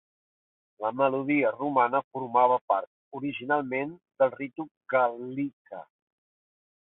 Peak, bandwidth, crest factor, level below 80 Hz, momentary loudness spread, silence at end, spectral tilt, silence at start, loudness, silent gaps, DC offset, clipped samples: -10 dBFS; 4 kHz; 20 dB; -78 dBFS; 14 LU; 1 s; -10 dB/octave; 0.8 s; -28 LUFS; 2.04-2.11 s, 2.61-2.68 s, 2.87-3.11 s, 4.71-4.81 s, 5.53-5.65 s; under 0.1%; under 0.1%